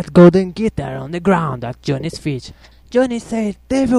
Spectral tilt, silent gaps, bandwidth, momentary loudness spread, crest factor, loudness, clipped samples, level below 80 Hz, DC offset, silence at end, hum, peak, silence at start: -7.5 dB/octave; none; 11 kHz; 15 LU; 16 dB; -17 LUFS; under 0.1%; -40 dBFS; under 0.1%; 0 s; none; 0 dBFS; 0 s